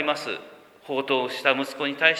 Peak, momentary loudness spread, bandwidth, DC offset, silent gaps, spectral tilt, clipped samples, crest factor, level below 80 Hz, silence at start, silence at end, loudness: -2 dBFS; 10 LU; 19 kHz; under 0.1%; none; -3.5 dB/octave; under 0.1%; 24 dB; -80 dBFS; 0 s; 0 s; -25 LUFS